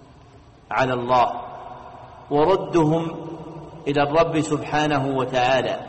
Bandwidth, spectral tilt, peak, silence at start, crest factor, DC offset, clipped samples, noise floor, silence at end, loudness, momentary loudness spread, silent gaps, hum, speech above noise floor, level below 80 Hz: 8.4 kHz; -6 dB/octave; -8 dBFS; 0 s; 14 dB; under 0.1%; under 0.1%; -48 dBFS; 0 s; -21 LUFS; 19 LU; none; none; 28 dB; -50 dBFS